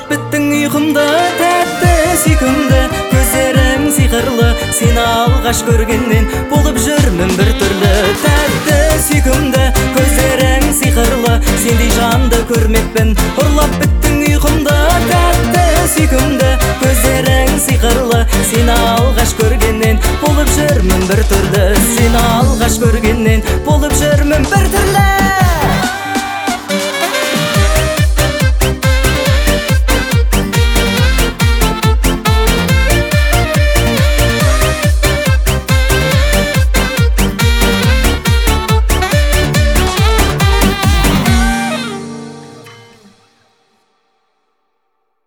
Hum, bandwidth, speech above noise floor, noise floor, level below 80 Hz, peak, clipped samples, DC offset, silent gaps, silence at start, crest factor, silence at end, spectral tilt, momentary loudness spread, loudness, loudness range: none; over 20 kHz; 57 dB; -67 dBFS; -16 dBFS; 0 dBFS; under 0.1%; under 0.1%; none; 0 s; 10 dB; 2.5 s; -4.5 dB/octave; 2 LU; -11 LUFS; 2 LU